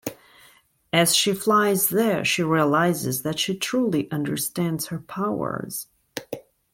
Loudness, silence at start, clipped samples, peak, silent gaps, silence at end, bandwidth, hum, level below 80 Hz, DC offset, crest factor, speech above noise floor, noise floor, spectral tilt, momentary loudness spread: -22 LUFS; 0.05 s; under 0.1%; -4 dBFS; none; 0.35 s; 17 kHz; none; -62 dBFS; under 0.1%; 20 dB; 34 dB; -56 dBFS; -4 dB/octave; 16 LU